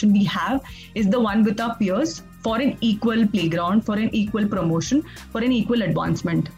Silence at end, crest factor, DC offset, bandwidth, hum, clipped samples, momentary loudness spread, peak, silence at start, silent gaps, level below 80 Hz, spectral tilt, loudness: 0 s; 12 dB; under 0.1%; 14.5 kHz; none; under 0.1%; 6 LU; -10 dBFS; 0 s; none; -46 dBFS; -6 dB/octave; -22 LUFS